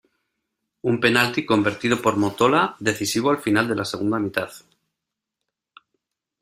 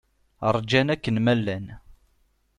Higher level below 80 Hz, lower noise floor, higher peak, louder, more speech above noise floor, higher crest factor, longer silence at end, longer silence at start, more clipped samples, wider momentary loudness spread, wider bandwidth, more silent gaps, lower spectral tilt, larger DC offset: second, -60 dBFS vs -52 dBFS; first, -84 dBFS vs -66 dBFS; about the same, -2 dBFS vs -4 dBFS; first, -21 LUFS vs -24 LUFS; first, 63 dB vs 43 dB; about the same, 22 dB vs 20 dB; first, 1.85 s vs 0.65 s; first, 0.85 s vs 0.4 s; neither; second, 7 LU vs 11 LU; first, 16 kHz vs 10.5 kHz; neither; second, -4.5 dB/octave vs -6.5 dB/octave; neither